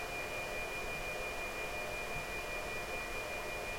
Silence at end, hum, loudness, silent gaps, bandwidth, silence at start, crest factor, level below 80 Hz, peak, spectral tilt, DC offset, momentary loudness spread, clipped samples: 0 s; none; -39 LUFS; none; 16.5 kHz; 0 s; 14 dB; -52 dBFS; -28 dBFS; -3 dB/octave; under 0.1%; 1 LU; under 0.1%